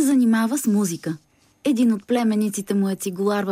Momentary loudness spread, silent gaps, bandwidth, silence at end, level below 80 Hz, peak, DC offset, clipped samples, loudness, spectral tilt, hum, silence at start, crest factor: 9 LU; none; 16 kHz; 0 s; -70 dBFS; -10 dBFS; under 0.1%; under 0.1%; -21 LUFS; -5.5 dB/octave; none; 0 s; 12 dB